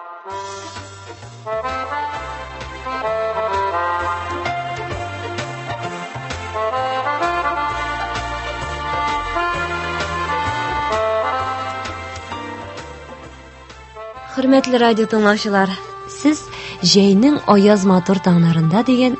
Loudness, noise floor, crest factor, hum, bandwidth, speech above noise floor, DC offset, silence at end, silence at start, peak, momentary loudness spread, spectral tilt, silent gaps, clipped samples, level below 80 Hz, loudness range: -18 LUFS; -39 dBFS; 18 dB; none; 8.6 kHz; 24 dB; under 0.1%; 0 s; 0 s; 0 dBFS; 18 LU; -5.5 dB/octave; none; under 0.1%; -40 dBFS; 9 LU